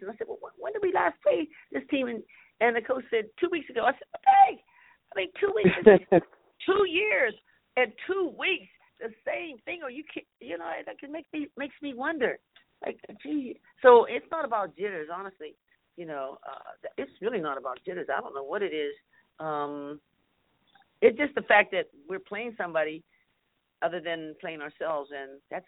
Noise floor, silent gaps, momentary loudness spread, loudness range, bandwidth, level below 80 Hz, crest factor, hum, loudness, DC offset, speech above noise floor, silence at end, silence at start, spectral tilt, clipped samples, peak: -76 dBFS; none; 19 LU; 12 LU; 4.1 kHz; -68 dBFS; 26 dB; none; -27 LUFS; under 0.1%; 48 dB; 0.05 s; 0 s; -9.5 dB/octave; under 0.1%; -2 dBFS